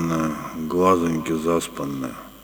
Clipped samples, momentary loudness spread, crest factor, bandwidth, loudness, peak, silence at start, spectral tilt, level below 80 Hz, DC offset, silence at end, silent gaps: under 0.1%; 11 LU; 18 dB; over 20 kHz; -23 LUFS; -4 dBFS; 0 s; -6 dB/octave; -52 dBFS; under 0.1%; 0 s; none